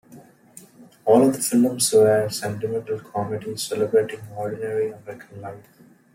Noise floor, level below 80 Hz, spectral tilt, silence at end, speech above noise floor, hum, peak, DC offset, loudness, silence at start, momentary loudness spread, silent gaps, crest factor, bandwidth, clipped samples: -49 dBFS; -66 dBFS; -4.5 dB/octave; 0.55 s; 27 dB; none; -4 dBFS; under 0.1%; -22 LUFS; 0.1 s; 20 LU; none; 18 dB; 16.5 kHz; under 0.1%